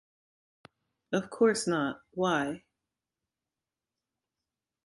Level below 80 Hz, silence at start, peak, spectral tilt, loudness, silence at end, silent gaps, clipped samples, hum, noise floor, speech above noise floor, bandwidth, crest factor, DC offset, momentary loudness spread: -72 dBFS; 1.1 s; -12 dBFS; -4.5 dB/octave; -30 LUFS; 2.3 s; none; under 0.1%; none; under -90 dBFS; over 61 dB; 11.5 kHz; 22 dB; under 0.1%; 9 LU